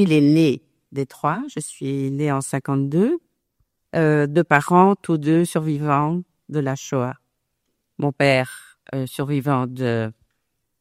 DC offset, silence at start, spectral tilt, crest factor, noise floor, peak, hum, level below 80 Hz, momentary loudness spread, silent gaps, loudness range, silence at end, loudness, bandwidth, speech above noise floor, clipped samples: under 0.1%; 0 s; -6.5 dB/octave; 20 dB; -75 dBFS; 0 dBFS; none; -62 dBFS; 13 LU; none; 5 LU; 0.7 s; -21 LUFS; 14.5 kHz; 55 dB; under 0.1%